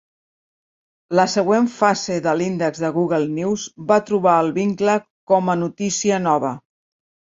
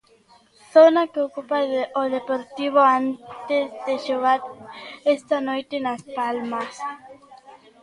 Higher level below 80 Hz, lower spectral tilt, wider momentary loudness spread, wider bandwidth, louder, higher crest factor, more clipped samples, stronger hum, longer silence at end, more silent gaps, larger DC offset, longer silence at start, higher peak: first, -62 dBFS vs -72 dBFS; about the same, -5 dB/octave vs -4.5 dB/octave; second, 6 LU vs 16 LU; second, 7.8 kHz vs 11 kHz; first, -19 LUFS vs -22 LUFS; about the same, 18 dB vs 20 dB; neither; neither; first, 0.8 s vs 0.25 s; first, 5.10-5.27 s vs none; neither; first, 1.1 s vs 0.75 s; about the same, -2 dBFS vs -2 dBFS